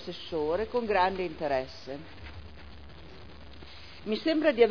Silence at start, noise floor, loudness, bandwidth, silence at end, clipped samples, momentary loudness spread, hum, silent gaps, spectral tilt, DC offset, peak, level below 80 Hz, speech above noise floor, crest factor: 0 s; -48 dBFS; -29 LUFS; 5.4 kHz; 0 s; under 0.1%; 23 LU; none; none; -6.5 dB/octave; 0.4%; -10 dBFS; -52 dBFS; 20 dB; 22 dB